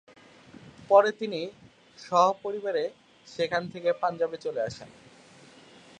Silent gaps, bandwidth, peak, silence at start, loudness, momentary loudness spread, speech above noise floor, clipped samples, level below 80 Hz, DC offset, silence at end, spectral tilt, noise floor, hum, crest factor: none; 9.6 kHz; -6 dBFS; 0.65 s; -27 LUFS; 15 LU; 27 dB; under 0.1%; -70 dBFS; under 0.1%; 1.15 s; -4.5 dB/octave; -53 dBFS; none; 24 dB